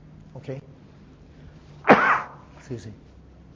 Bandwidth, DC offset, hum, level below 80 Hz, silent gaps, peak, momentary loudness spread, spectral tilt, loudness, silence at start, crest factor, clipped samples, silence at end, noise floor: 7.6 kHz; under 0.1%; none; -54 dBFS; none; 0 dBFS; 25 LU; -6.5 dB/octave; -19 LUFS; 0.35 s; 26 dB; under 0.1%; 0.6 s; -49 dBFS